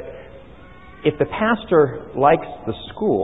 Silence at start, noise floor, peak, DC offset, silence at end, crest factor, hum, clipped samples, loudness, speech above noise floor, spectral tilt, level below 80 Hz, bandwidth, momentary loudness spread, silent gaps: 0 s; -43 dBFS; -2 dBFS; 0.4%; 0 s; 18 dB; none; under 0.1%; -20 LUFS; 24 dB; -10 dB/octave; -48 dBFS; 4 kHz; 13 LU; none